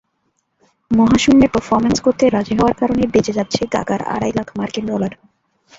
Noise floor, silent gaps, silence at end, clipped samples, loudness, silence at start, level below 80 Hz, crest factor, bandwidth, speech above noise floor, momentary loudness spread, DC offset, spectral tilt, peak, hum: -68 dBFS; none; 0.65 s; under 0.1%; -16 LUFS; 0.9 s; -40 dBFS; 16 dB; 8 kHz; 52 dB; 10 LU; under 0.1%; -5.5 dB/octave; 0 dBFS; none